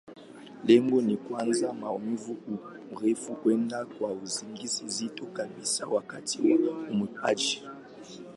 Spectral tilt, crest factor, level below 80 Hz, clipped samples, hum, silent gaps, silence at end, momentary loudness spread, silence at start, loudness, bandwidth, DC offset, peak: -4 dB/octave; 20 dB; -76 dBFS; under 0.1%; none; none; 0 s; 15 LU; 0.05 s; -29 LUFS; 11.5 kHz; under 0.1%; -8 dBFS